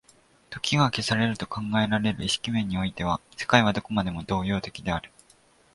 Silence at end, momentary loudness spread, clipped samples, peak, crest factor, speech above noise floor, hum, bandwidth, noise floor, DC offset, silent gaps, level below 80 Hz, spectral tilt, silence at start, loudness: 0.7 s; 9 LU; under 0.1%; -2 dBFS; 24 dB; 34 dB; none; 11.5 kHz; -59 dBFS; under 0.1%; none; -48 dBFS; -5 dB/octave; 0.5 s; -26 LUFS